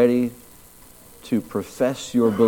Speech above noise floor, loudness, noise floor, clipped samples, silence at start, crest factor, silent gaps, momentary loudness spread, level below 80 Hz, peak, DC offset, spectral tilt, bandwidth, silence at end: 27 dB; -24 LUFS; -47 dBFS; under 0.1%; 0 s; 18 dB; none; 16 LU; -56 dBFS; -4 dBFS; under 0.1%; -6 dB/octave; 18.5 kHz; 0 s